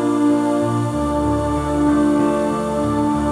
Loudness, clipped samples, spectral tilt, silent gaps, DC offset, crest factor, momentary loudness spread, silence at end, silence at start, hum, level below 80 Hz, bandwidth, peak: -18 LUFS; under 0.1%; -7 dB/octave; none; under 0.1%; 10 dB; 4 LU; 0 s; 0 s; none; -34 dBFS; 12 kHz; -6 dBFS